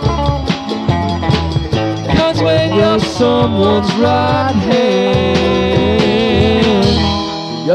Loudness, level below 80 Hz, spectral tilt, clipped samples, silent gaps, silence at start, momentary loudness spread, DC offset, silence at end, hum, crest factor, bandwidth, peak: -13 LUFS; -28 dBFS; -6.5 dB/octave; under 0.1%; none; 0 s; 5 LU; under 0.1%; 0 s; none; 12 dB; 11 kHz; 0 dBFS